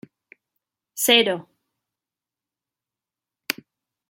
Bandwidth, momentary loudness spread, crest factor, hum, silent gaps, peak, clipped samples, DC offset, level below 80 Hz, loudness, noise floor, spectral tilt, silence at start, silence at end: 16.5 kHz; 21 LU; 26 dB; none; none; -2 dBFS; under 0.1%; under 0.1%; -78 dBFS; -20 LUFS; -89 dBFS; -1.5 dB/octave; 0.95 s; 0.55 s